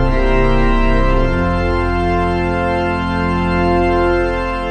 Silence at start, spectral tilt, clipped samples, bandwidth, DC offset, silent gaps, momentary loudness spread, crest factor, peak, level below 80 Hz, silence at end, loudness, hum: 0 s; -7.5 dB/octave; under 0.1%; 8.8 kHz; under 0.1%; none; 3 LU; 12 dB; -2 dBFS; -18 dBFS; 0 s; -16 LUFS; none